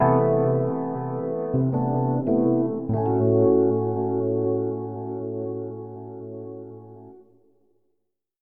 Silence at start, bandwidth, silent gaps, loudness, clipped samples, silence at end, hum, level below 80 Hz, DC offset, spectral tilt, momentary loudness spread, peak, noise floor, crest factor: 0 s; 2.8 kHz; none; -24 LUFS; under 0.1%; 1.2 s; none; -58 dBFS; 0.3%; -14 dB/octave; 18 LU; -8 dBFS; -78 dBFS; 16 dB